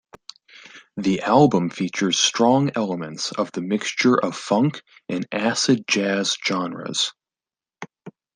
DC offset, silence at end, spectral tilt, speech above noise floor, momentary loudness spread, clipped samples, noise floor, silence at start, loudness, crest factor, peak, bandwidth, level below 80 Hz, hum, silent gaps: under 0.1%; 0.25 s; -4 dB/octave; over 69 dB; 14 LU; under 0.1%; under -90 dBFS; 0.65 s; -21 LUFS; 20 dB; -2 dBFS; 10 kHz; -64 dBFS; none; none